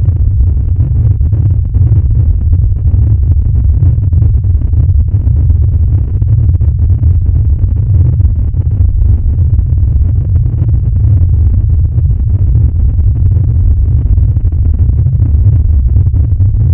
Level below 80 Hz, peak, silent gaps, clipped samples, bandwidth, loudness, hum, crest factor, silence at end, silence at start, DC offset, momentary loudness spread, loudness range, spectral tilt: -12 dBFS; 0 dBFS; none; 0.4%; 1.4 kHz; -10 LUFS; none; 8 dB; 0 s; 0 s; under 0.1%; 2 LU; 1 LU; -14 dB/octave